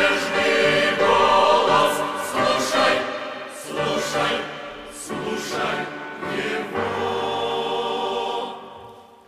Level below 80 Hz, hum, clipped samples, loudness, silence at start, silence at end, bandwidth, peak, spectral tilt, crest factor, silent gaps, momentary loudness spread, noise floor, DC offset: -58 dBFS; none; under 0.1%; -21 LUFS; 0 s; 0.25 s; 15.5 kHz; -4 dBFS; -3 dB/octave; 18 dB; none; 15 LU; -44 dBFS; under 0.1%